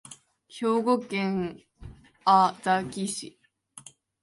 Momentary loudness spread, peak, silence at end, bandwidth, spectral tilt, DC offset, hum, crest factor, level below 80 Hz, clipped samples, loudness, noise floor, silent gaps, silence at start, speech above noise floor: 26 LU; -8 dBFS; 0.45 s; 11.5 kHz; -5 dB/octave; under 0.1%; none; 20 dB; -60 dBFS; under 0.1%; -26 LUFS; -51 dBFS; none; 0.1 s; 25 dB